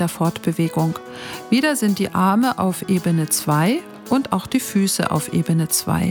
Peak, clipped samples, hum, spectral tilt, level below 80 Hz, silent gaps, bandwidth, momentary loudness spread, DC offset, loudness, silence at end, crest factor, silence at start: -2 dBFS; under 0.1%; none; -5 dB/octave; -52 dBFS; none; over 20 kHz; 5 LU; under 0.1%; -19 LUFS; 0 s; 16 dB; 0 s